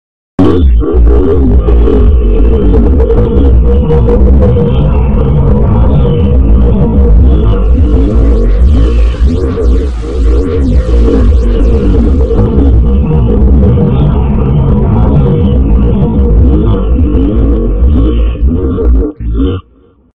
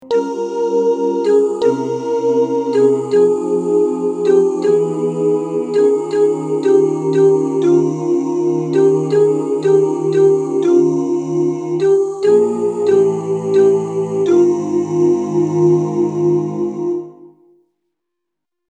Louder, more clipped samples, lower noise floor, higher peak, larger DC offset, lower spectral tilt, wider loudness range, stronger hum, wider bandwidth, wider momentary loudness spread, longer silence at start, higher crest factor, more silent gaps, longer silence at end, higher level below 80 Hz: first, -8 LUFS vs -15 LUFS; first, 4% vs under 0.1%; second, -43 dBFS vs -80 dBFS; about the same, 0 dBFS vs -2 dBFS; first, 8% vs under 0.1%; first, -10.5 dB/octave vs -7.5 dB/octave; about the same, 2 LU vs 1 LU; neither; second, 4.1 kHz vs 9.2 kHz; about the same, 4 LU vs 5 LU; first, 0.4 s vs 0 s; second, 6 dB vs 14 dB; neither; second, 0 s vs 1.45 s; first, -8 dBFS vs -70 dBFS